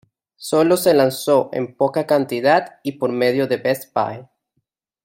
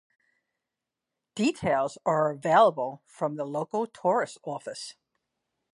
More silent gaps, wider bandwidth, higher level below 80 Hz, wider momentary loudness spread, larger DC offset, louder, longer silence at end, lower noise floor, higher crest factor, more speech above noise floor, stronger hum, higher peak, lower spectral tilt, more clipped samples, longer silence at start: neither; first, 16.5 kHz vs 11.5 kHz; first, -64 dBFS vs -70 dBFS; second, 10 LU vs 16 LU; neither; first, -18 LUFS vs -27 LUFS; about the same, 0.8 s vs 0.85 s; second, -73 dBFS vs -87 dBFS; about the same, 16 dB vs 20 dB; second, 55 dB vs 61 dB; neither; first, -2 dBFS vs -8 dBFS; about the same, -5 dB/octave vs -5.5 dB/octave; neither; second, 0.4 s vs 1.35 s